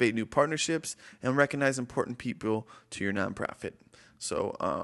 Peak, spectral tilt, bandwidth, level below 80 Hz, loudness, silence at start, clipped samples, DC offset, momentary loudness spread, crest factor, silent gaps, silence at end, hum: -10 dBFS; -4.5 dB/octave; 12.5 kHz; -60 dBFS; -31 LUFS; 0 s; under 0.1%; under 0.1%; 12 LU; 22 dB; none; 0 s; none